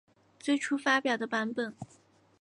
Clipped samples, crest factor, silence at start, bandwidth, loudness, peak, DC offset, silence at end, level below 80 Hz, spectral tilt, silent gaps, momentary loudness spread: under 0.1%; 20 dB; 0.45 s; 11 kHz; -30 LUFS; -12 dBFS; under 0.1%; 0.55 s; -80 dBFS; -3.5 dB/octave; none; 15 LU